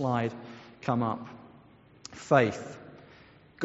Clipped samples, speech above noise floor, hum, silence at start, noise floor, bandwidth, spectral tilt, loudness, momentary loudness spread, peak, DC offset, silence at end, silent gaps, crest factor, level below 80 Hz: under 0.1%; 28 dB; none; 0 s; -56 dBFS; 8 kHz; -6 dB/octave; -29 LUFS; 24 LU; -6 dBFS; under 0.1%; 0 s; none; 24 dB; -66 dBFS